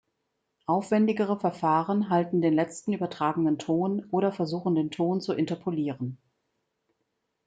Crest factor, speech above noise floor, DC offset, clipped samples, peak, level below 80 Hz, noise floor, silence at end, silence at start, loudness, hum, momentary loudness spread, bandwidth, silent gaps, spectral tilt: 16 dB; 53 dB; under 0.1%; under 0.1%; -12 dBFS; -72 dBFS; -79 dBFS; 1.3 s; 0.7 s; -27 LUFS; none; 6 LU; 9.2 kHz; none; -7.5 dB/octave